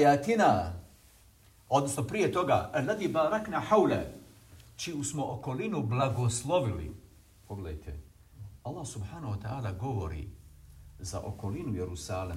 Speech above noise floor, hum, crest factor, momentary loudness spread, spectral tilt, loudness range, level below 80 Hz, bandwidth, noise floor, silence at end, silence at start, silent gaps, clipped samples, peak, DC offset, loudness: 29 dB; none; 20 dB; 19 LU; -5.5 dB/octave; 10 LU; -54 dBFS; 16 kHz; -59 dBFS; 0 s; 0 s; none; under 0.1%; -12 dBFS; under 0.1%; -31 LUFS